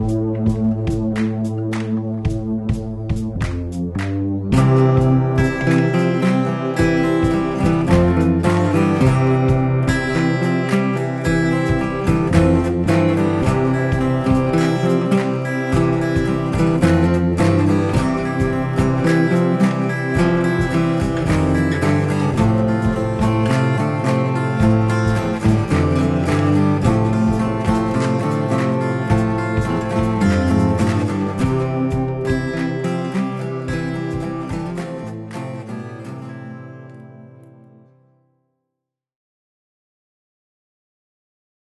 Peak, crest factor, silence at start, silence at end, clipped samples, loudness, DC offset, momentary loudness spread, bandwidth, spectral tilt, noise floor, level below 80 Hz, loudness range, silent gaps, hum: 0 dBFS; 18 dB; 0 s; 4.25 s; under 0.1%; -18 LUFS; under 0.1%; 8 LU; 12 kHz; -7.5 dB/octave; -81 dBFS; -32 dBFS; 7 LU; none; none